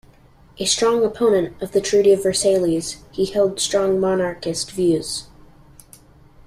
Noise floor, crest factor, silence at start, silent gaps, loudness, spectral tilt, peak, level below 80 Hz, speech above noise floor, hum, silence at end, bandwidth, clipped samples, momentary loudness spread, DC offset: -50 dBFS; 16 dB; 0.6 s; none; -19 LUFS; -4 dB/octave; -4 dBFS; -50 dBFS; 31 dB; none; 1.25 s; 15 kHz; under 0.1%; 9 LU; under 0.1%